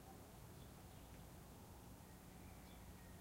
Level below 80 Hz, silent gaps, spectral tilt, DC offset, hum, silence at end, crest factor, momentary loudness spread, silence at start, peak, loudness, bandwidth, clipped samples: -66 dBFS; none; -5 dB/octave; under 0.1%; none; 0 s; 12 dB; 1 LU; 0 s; -48 dBFS; -60 LUFS; 16 kHz; under 0.1%